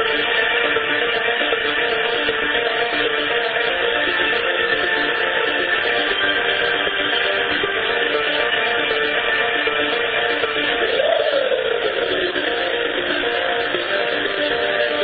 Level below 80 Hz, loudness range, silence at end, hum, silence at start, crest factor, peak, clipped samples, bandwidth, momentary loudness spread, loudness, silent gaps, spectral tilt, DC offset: -50 dBFS; 2 LU; 0 s; none; 0 s; 16 dB; -4 dBFS; under 0.1%; 4.9 kHz; 3 LU; -18 LUFS; none; -6 dB/octave; under 0.1%